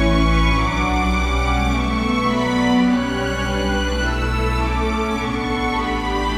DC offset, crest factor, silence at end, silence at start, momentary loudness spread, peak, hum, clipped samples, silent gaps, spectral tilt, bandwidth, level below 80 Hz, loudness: under 0.1%; 14 dB; 0 s; 0 s; 5 LU; -4 dBFS; none; under 0.1%; none; -5.5 dB/octave; 12.5 kHz; -24 dBFS; -19 LUFS